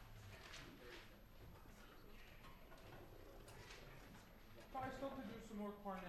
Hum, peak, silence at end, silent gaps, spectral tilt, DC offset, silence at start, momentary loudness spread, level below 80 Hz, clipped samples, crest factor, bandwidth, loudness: none; -38 dBFS; 0 s; none; -5 dB/octave; under 0.1%; 0 s; 13 LU; -64 dBFS; under 0.1%; 18 dB; 13.5 kHz; -56 LUFS